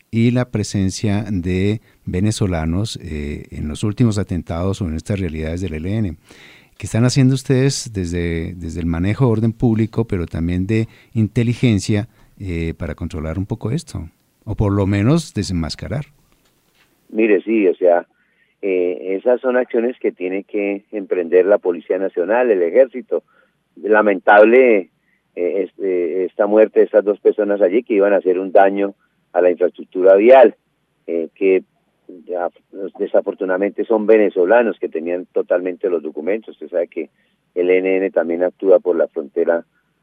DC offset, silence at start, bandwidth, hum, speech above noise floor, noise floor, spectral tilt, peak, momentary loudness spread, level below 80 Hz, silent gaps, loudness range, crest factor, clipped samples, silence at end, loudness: under 0.1%; 0.15 s; 12 kHz; none; 42 dB; -58 dBFS; -7 dB/octave; 0 dBFS; 12 LU; -40 dBFS; none; 7 LU; 18 dB; under 0.1%; 0.4 s; -17 LUFS